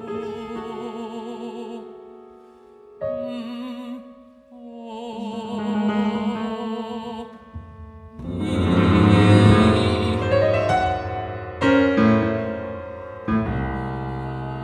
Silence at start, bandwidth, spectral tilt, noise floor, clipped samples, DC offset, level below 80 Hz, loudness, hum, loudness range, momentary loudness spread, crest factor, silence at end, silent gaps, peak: 0 s; 10 kHz; -7.5 dB/octave; -47 dBFS; under 0.1%; under 0.1%; -42 dBFS; -21 LUFS; none; 16 LU; 21 LU; 20 dB; 0 s; none; -2 dBFS